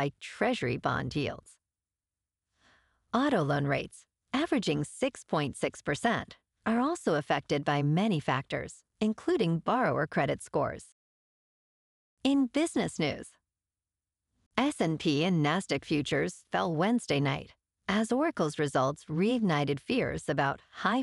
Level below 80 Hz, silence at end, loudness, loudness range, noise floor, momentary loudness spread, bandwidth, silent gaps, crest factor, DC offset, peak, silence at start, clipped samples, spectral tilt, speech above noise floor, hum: -60 dBFS; 0 s; -30 LUFS; 4 LU; under -90 dBFS; 7 LU; 12 kHz; 10.92-12.17 s, 14.46-14.51 s; 20 dB; under 0.1%; -12 dBFS; 0 s; under 0.1%; -5.5 dB/octave; over 60 dB; none